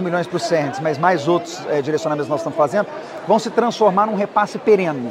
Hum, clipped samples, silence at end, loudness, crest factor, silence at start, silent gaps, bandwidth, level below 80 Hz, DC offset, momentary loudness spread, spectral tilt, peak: none; under 0.1%; 0 s; -19 LUFS; 18 dB; 0 s; none; 13 kHz; -68 dBFS; under 0.1%; 6 LU; -5.5 dB/octave; -2 dBFS